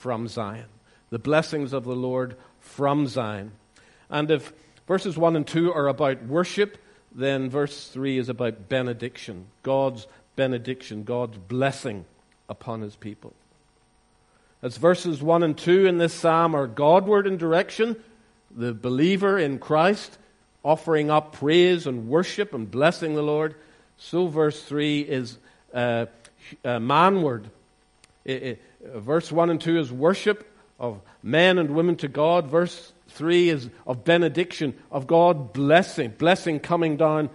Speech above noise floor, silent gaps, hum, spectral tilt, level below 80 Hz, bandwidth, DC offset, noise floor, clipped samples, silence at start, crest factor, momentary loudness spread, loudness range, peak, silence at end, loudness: 39 dB; none; none; -6 dB/octave; -64 dBFS; 11.5 kHz; under 0.1%; -62 dBFS; under 0.1%; 0 s; 20 dB; 16 LU; 7 LU; -4 dBFS; 0 s; -23 LUFS